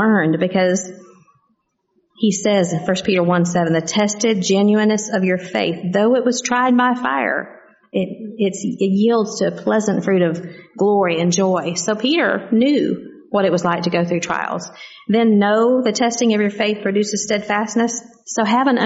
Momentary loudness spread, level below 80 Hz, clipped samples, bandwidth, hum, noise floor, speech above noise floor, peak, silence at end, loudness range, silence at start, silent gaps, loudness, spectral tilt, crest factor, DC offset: 8 LU; -62 dBFS; under 0.1%; 8 kHz; none; -67 dBFS; 50 dB; -4 dBFS; 0 s; 2 LU; 0 s; none; -18 LUFS; -5 dB/octave; 14 dB; under 0.1%